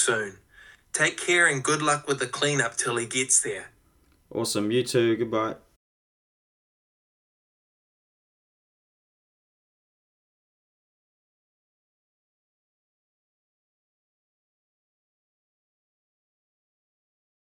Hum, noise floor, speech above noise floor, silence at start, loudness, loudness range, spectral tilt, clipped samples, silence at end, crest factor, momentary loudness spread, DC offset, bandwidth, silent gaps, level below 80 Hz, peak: none; -63 dBFS; 38 dB; 0 s; -24 LUFS; 8 LU; -2.5 dB/octave; under 0.1%; 11.9 s; 24 dB; 12 LU; under 0.1%; 19 kHz; none; -70 dBFS; -8 dBFS